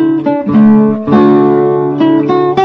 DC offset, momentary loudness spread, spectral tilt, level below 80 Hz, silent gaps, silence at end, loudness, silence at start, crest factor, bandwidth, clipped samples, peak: under 0.1%; 5 LU; -9.5 dB/octave; -46 dBFS; none; 0 s; -9 LUFS; 0 s; 8 dB; 5.4 kHz; under 0.1%; 0 dBFS